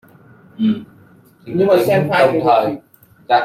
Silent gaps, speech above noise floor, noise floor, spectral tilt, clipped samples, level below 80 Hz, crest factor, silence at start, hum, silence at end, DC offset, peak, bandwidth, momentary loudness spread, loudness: none; 33 dB; -47 dBFS; -6.5 dB/octave; under 0.1%; -58 dBFS; 16 dB; 0.6 s; none; 0 s; under 0.1%; -2 dBFS; 16.5 kHz; 12 LU; -16 LUFS